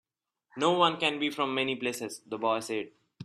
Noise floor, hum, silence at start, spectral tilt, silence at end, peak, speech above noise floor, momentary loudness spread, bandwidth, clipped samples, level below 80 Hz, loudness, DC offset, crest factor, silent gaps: -75 dBFS; none; 0.55 s; -3.5 dB/octave; 0 s; -10 dBFS; 45 dB; 13 LU; 13.5 kHz; under 0.1%; -74 dBFS; -29 LUFS; under 0.1%; 20 dB; none